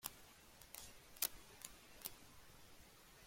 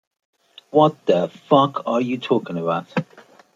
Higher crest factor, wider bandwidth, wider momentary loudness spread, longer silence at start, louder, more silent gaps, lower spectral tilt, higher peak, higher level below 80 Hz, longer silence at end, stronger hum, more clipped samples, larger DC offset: first, 36 dB vs 18 dB; first, 16.5 kHz vs 7.6 kHz; first, 19 LU vs 7 LU; second, 0 s vs 0.75 s; second, -49 LUFS vs -20 LUFS; neither; second, -0.5 dB/octave vs -7.5 dB/octave; second, -18 dBFS vs -2 dBFS; about the same, -70 dBFS vs -70 dBFS; second, 0 s vs 0.5 s; neither; neither; neither